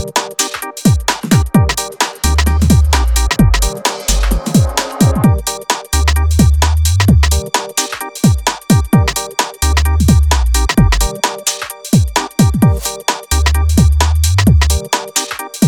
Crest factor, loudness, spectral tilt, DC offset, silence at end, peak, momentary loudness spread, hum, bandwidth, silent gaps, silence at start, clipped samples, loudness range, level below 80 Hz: 12 dB; -13 LUFS; -4.5 dB/octave; under 0.1%; 0 s; 0 dBFS; 6 LU; none; 19.5 kHz; none; 0 s; under 0.1%; 1 LU; -16 dBFS